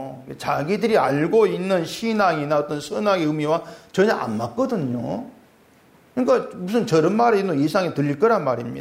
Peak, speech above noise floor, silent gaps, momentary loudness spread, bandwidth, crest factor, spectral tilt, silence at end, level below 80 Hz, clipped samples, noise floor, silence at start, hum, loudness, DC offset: -6 dBFS; 33 dB; none; 8 LU; 16 kHz; 14 dB; -6.5 dB/octave; 0 s; -62 dBFS; under 0.1%; -54 dBFS; 0 s; none; -21 LUFS; under 0.1%